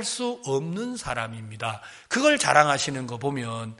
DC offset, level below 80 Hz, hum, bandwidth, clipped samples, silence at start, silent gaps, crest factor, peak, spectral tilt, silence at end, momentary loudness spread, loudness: under 0.1%; -58 dBFS; none; 11.5 kHz; under 0.1%; 0 s; none; 24 dB; -2 dBFS; -3.5 dB/octave; 0.05 s; 14 LU; -25 LUFS